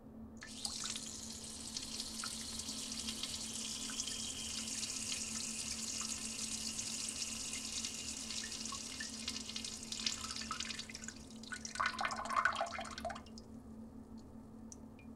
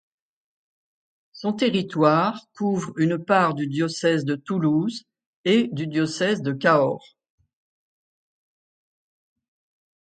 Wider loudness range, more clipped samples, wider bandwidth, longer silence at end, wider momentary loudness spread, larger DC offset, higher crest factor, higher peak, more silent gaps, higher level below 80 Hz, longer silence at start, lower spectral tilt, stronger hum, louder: about the same, 2 LU vs 4 LU; neither; first, 16 kHz vs 9.2 kHz; second, 0 s vs 3.05 s; first, 15 LU vs 9 LU; neither; about the same, 24 dB vs 20 dB; second, -18 dBFS vs -4 dBFS; second, none vs 5.26-5.44 s; first, -62 dBFS vs -70 dBFS; second, 0 s vs 1.35 s; second, -1 dB/octave vs -6 dB/octave; neither; second, -40 LUFS vs -22 LUFS